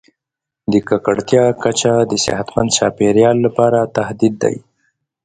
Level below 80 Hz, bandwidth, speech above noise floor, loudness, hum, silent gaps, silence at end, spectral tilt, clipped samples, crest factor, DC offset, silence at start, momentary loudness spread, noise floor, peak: -48 dBFS; 10 kHz; 70 dB; -15 LUFS; none; none; 0.65 s; -4.5 dB/octave; under 0.1%; 16 dB; under 0.1%; 0.7 s; 7 LU; -84 dBFS; 0 dBFS